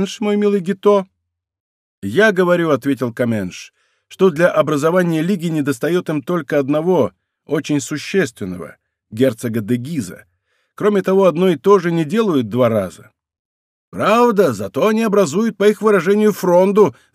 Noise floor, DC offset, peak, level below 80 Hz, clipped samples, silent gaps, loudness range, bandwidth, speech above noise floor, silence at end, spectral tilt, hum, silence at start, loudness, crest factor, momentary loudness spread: -65 dBFS; under 0.1%; -2 dBFS; -64 dBFS; under 0.1%; 1.60-2.02 s, 13.39-13.92 s; 5 LU; 15.5 kHz; 49 dB; 0.2 s; -6 dB/octave; none; 0 s; -16 LUFS; 16 dB; 10 LU